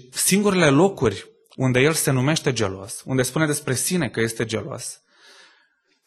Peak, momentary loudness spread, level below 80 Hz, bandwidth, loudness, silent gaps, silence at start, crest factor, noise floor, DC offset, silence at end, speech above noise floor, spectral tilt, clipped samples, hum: -2 dBFS; 12 LU; -54 dBFS; 12.5 kHz; -21 LUFS; none; 0.15 s; 20 dB; -64 dBFS; under 0.1%; 1.1 s; 43 dB; -4.5 dB/octave; under 0.1%; none